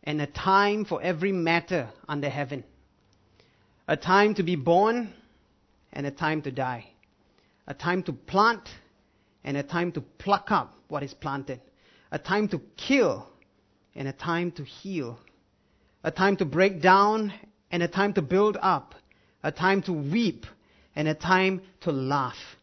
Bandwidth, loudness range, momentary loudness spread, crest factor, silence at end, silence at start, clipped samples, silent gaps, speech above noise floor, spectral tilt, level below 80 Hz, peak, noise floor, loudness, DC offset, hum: 6.4 kHz; 6 LU; 15 LU; 24 dB; 0.1 s; 0.05 s; under 0.1%; none; 40 dB; -6 dB/octave; -60 dBFS; -4 dBFS; -66 dBFS; -26 LUFS; under 0.1%; none